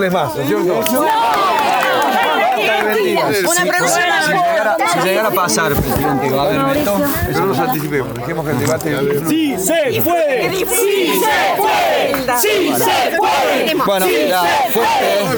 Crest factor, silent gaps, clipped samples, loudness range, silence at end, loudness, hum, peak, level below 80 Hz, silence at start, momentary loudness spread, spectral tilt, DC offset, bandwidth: 14 dB; none; under 0.1%; 3 LU; 0 s; -14 LUFS; none; 0 dBFS; -40 dBFS; 0 s; 3 LU; -3.5 dB/octave; under 0.1%; over 20 kHz